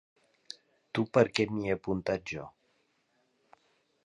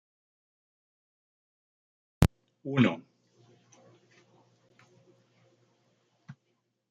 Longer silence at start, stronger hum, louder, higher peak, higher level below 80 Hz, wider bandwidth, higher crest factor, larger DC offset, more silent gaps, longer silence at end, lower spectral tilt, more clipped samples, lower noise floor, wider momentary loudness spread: second, 0.95 s vs 2.2 s; neither; about the same, -31 LUFS vs -29 LUFS; second, -8 dBFS vs -4 dBFS; second, -62 dBFS vs -48 dBFS; first, 10.5 kHz vs 8.8 kHz; second, 26 dB vs 32 dB; neither; neither; first, 1.55 s vs 0.6 s; about the same, -6 dB/octave vs -7 dB/octave; neither; second, -74 dBFS vs -78 dBFS; second, 21 LU vs 27 LU